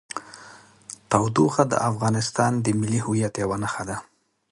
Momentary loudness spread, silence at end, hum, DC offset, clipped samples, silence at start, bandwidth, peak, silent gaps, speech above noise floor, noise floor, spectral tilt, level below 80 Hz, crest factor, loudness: 21 LU; 0.5 s; none; under 0.1%; under 0.1%; 0.15 s; 11.5 kHz; -2 dBFS; none; 25 dB; -48 dBFS; -5.5 dB/octave; -54 dBFS; 22 dB; -23 LUFS